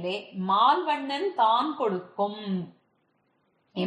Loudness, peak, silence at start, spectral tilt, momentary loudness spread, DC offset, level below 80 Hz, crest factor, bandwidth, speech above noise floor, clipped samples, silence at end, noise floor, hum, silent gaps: -26 LUFS; -10 dBFS; 0 s; -6.5 dB/octave; 11 LU; under 0.1%; -78 dBFS; 18 dB; 9.6 kHz; 45 dB; under 0.1%; 0 s; -71 dBFS; none; none